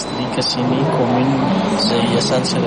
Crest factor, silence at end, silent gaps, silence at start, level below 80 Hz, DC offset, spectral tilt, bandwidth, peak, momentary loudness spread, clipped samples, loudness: 12 dB; 0 s; none; 0 s; -46 dBFS; under 0.1%; -5 dB/octave; 10.5 kHz; -4 dBFS; 2 LU; under 0.1%; -16 LUFS